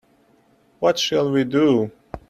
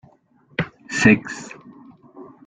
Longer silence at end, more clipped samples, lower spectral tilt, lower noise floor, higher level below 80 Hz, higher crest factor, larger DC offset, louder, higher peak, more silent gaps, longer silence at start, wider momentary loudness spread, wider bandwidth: about the same, 0.1 s vs 0.2 s; neither; about the same, -5 dB/octave vs -5 dB/octave; about the same, -58 dBFS vs -56 dBFS; about the same, -54 dBFS vs -52 dBFS; second, 16 dB vs 22 dB; neither; about the same, -20 LUFS vs -19 LUFS; second, -6 dBFS vs -2 dBFS; neither; first, 0.8 s vs 0.6 s; second, 5 LU vs 22 LU; first, 14 kHz vs 9.4 kHz